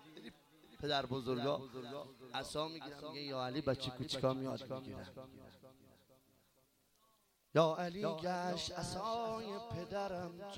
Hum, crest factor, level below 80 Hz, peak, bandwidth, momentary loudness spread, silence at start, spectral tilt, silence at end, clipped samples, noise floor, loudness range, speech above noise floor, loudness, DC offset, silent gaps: none; 24 dB; -68 dBFS; -18 dBFS; 16.5 kHz; 14 LU; 0 s; -5 dB/octave; 0 s; under 0.1%; -75 dBFS; 6 LU; 35 dB; -40 LUFS; under 0.1%; none